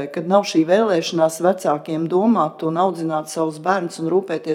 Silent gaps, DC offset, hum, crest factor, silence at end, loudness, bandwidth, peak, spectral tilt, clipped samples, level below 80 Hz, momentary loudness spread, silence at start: none; under 0.1%; none; 16 dB; 0 s; -19 LUFS; 15.5 kHz; -2 dBFS; -5.5 dB/octave; under 0.1%; -74 dBFS; 6 LU; 0 s